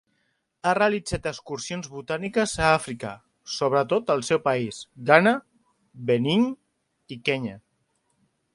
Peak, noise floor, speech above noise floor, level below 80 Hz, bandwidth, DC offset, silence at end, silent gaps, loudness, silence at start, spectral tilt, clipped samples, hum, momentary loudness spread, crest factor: 0 dBFS; -72 dBFS; 49 dB; -54 dBFS; 11.5 kHz; under 0.1%; 0.95 s; none; -24 LUFS; 0.65 s; -5 dB/octave; under 0.1%; none; 14 LU; 26 dB